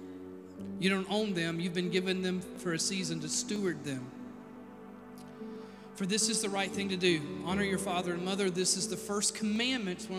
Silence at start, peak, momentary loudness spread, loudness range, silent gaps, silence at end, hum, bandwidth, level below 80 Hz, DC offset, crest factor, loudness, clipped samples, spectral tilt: 0 s; -14 dBFS; 18 LU; 5 LU; none; 0 s; none; 15.5 kHz; -70 dBFS; under 0.1%; 20 dB; -32 LUFS; under 0.1%; -3.5 dB/octave